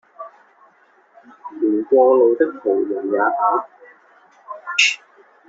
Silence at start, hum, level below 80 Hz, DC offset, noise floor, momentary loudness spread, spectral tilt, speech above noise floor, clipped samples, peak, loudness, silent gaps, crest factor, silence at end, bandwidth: 0.2 s; none; -70 dBFS; under 0.1%; -55 dBFS; 25 LU; 0 dB/octave; 37 dB; under 0.1%; -2 dBFS; -17 LUFS; none; 18 dB; 0.5 s; 8 kHz